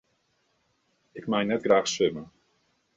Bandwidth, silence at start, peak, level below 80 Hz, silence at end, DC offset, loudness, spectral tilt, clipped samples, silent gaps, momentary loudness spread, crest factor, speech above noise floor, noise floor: 8.2 kHz; 1.15 s; -8 dBFS; -68 dBFS; 0.7 s; under 0.1%; -25 LUFS; -4 dB/octave; under 0.1%; none; 18 LU; 20 dB; 46 dB; -72 dBFS